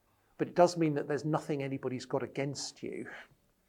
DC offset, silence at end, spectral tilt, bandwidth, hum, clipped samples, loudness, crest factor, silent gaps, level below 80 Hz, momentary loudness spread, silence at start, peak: under 0.1%; 0.45 s; -6 dB/octave; 13.5 kHz; none; under 0.1%; -33 LUFS; 24 dB; none; -74 dBFS; 15 LU; 0.4 s; -10 dBFS